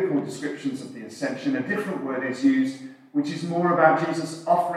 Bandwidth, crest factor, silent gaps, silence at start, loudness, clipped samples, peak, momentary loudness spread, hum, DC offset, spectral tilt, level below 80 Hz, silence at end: 13 kHz; 20 dB; none; 0 s; -25 LUFS; under 0.1%; -4 dBFS; 12 LU; none; under 0.1%; -6 dB/octave; -84 dBFS; 0 s